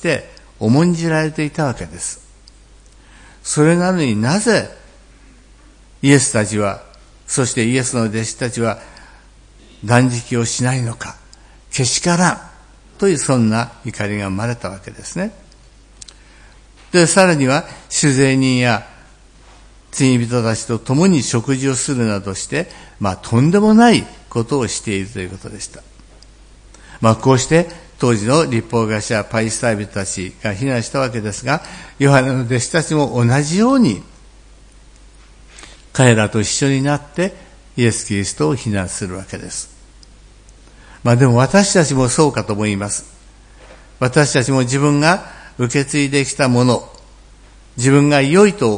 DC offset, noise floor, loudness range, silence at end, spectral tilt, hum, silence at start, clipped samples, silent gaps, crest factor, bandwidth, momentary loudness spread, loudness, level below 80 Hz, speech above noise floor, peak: under 0.1%; -45 dBFS; 4 LU; 0 s; -5 dB/octave; none; 0 s; under 0.1%; none; 16 dB; 10.5 kHz; 13 LU; -16 LUFS; -44 dBFS; 29 dB; 0 dBFS